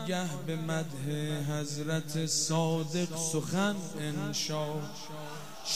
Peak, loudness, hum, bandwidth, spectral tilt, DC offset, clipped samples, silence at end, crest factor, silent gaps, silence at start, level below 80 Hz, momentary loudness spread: -16 dBFS; -33 LUFS; none; 16 kHz; -4 dB/octave; 0.5%; under 0.1%; 0 s; 18 dB; none; 0 s; -68 dBFS; 10 LU